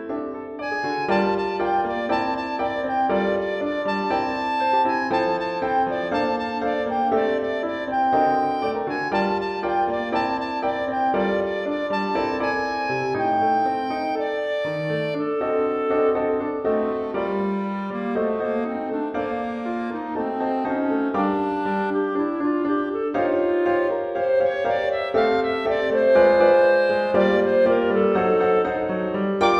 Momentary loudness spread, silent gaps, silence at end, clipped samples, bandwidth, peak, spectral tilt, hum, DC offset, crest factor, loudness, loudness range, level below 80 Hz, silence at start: 7 LU; none; 0 s; under 0.1%; 8.4 kHz; -6 dBFS; -7 dB/octave; none; under 0.1%; 16 dB; -22 LUFS; 6 LU; -56 dBFS; 0 s